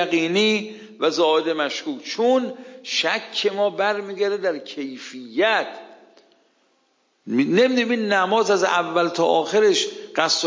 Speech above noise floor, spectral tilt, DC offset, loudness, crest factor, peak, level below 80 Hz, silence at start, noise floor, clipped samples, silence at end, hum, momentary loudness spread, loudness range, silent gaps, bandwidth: 45 dB; -3.5 dB/octave; under 0.1%; -21 LUFS; 20 dB; -2 dBFS; -80 dBFS; 0 s; -66 dBFS; under 0.1%; 0 s; none; 12 LU; 6 LU; none; 7.6 kHz